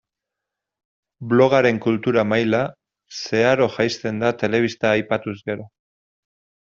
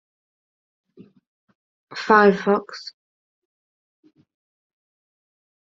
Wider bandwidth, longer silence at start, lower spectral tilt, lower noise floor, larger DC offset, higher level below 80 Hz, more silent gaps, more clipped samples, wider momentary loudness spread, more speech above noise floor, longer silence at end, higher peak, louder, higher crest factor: about the same, 7.6 kHz vs 7.6 kHz; second, 1.2 s vs 1.9 s; about the same, -4.5 dB/octave vs -4 dB/octave; second, -84 dBFS vs under -90 dBFS; neither; first, -60 dBFS vs -70 dBFS; neither; neither; second, 13 LU vs 22 LU; second, 65 dB vs over 72 dB; second, 0.95 s vs 2.85 s; about the same, -2 dBFS vs -2 dBFS; second, -20 LUFS vs -17 LUFS; second, 18 dB vs 24 dB